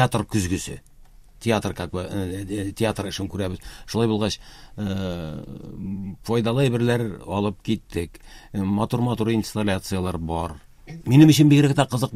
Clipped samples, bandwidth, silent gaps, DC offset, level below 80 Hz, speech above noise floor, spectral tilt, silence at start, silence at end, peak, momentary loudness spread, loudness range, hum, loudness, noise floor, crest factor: under 0.1%; 15.5 kHz; none; under 0.1%; -44 dBFS; 25 dB; -6 dB/octave; 0 s; 0 s; -2 dBFS; 17 LU; 8 LU; none; -23 LUFS; -48 dBFS; 20 dB